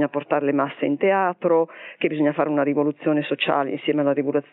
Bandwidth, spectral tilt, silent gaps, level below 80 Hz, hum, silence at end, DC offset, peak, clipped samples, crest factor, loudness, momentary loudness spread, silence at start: 4.1 kHz; -10.5 dB/octave; none; -76 dBFS; none; 0.1 s; under 0.1%; -6 dBFS; under 0.1%; 16 dB; -22 LUFS; 3 LU; 0 s